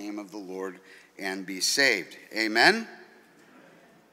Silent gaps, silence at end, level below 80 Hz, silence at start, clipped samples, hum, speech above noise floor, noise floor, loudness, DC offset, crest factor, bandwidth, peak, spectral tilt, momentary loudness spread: none; 1.1 s; -82 dBFS; 0 s; under 0.1%; none; 28 dB; -56 dBFS; -25 LUFS; under 0.1%; 26 dB; 16 kHz; -4 dBFS; -1.5 dB/octave; 18 LU